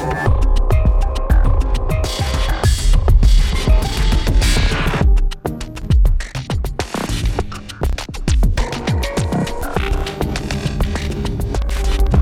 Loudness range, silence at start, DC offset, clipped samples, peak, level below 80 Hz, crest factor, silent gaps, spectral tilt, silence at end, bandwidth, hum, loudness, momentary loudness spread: 4 LU; 0 s; under 0.1%; under 0.1%; -2 dBFS; -16 dBFS; 14 dB; none; -5.5 dB/octave; 0 s; 14.5 kHz; none; -19 LUFS; 7 LU